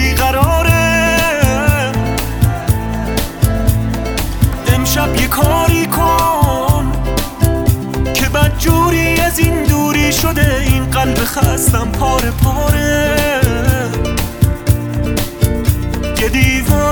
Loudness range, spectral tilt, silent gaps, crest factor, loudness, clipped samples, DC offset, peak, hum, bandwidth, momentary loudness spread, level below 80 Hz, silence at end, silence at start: 3 LU; -5 dB/octave; none; 12 dB; -14 LUFS; under 0.1%; under 0.1%; 0 dBFS; none; over 20 kHz; 6 LU; -20 dBFS; 0 s; 0 s